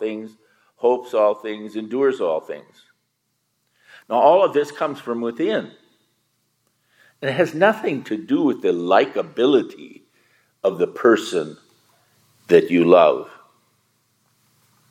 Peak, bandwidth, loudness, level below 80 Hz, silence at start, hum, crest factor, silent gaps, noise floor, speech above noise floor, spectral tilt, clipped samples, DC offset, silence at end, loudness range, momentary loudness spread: 0 dBFS; 15.5 kHz; -19 LUFS; -76 dBFS; 0 s; none; 20 dB; none; -72 dBFS; 53 dB; -6 dB/octave; under 0.1%; under 0.1%; 1.6 s; 5 LU; 15 LU